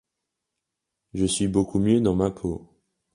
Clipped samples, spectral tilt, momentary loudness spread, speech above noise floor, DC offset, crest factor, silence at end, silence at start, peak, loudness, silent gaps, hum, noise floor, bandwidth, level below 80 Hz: under 0.1%; -6 dB/octave; 13 LU; 60 dB; under 0.1%; 18 dB; 0.5 s; 1.15 s; -8 dBFS; -24 LUFS; none; none; -83 dBFS; 11.5 kHz; -46 dBFS